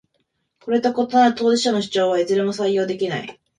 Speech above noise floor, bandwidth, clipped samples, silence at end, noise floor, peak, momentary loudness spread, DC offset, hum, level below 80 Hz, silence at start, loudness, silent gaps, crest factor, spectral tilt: 52 dB; 11 kHz; under 0.1%; 0.25 s; -71 dBFS; -4 dBFS; 8 LU; under 0.1%; none; -64 dBFS; 0.65 s; -19 LUFS; none; 16 dB; -4.5 dB/octave